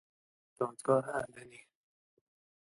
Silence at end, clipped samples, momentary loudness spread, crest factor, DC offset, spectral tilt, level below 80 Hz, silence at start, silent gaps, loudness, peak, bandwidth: 1.1 s; under 0.1%; 21 LU; 24 dB; under 0.1%; -6.5 dB/octave; -76 dBFS; 0.6 s; none; -34 LUFS; -16 dBFS; 11.5 kHz